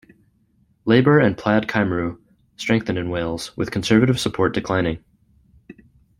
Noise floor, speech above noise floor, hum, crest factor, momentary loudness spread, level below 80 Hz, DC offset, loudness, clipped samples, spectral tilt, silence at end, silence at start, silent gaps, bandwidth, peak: -61 dBFS; 42 dB; none; 20 dB; 11 LU; -48 dBFS; under 0.1%; -20 LUFS; under 0.1%; -6 dB/octave; 0.45 s; 0.85 s; none; 16 kHz; -2 dBFS